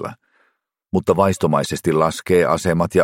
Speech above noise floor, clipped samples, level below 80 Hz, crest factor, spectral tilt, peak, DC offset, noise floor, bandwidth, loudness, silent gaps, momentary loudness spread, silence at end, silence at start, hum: 50 dB; under 0.1%; -48 dBFS; 18 dB; -6 dB/octave; -2 dBFS; under 0.1%; -67 dBFS; 16.5 kHz; -18 LUFS; none; 5 LU; 0 s; 0 s; none